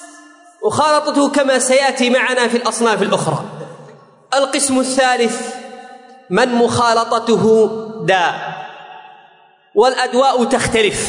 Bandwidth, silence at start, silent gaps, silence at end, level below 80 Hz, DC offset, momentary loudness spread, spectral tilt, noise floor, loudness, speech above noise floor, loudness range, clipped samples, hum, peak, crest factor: 11 kHz; 0 s; none; 0 s; -52 dBFS; under 0.1%; 14 LU; -3.5 dB/octave; -49 dBFS; -15 LUFS; 35 dB; 3 LU; under 0.1%; none; -2 dBFS; 14 dB